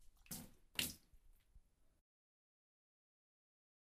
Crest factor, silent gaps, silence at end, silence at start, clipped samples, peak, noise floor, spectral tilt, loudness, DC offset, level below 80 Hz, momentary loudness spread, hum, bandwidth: 34 dB; none; 2.05 s; 0 s; under 0.1%; -22 dBFS; -70 dBFS; -1 dB/octave; -47 LUFS; under 0.1%; -72 dBFS; 11 LU; none; 15.5 kHz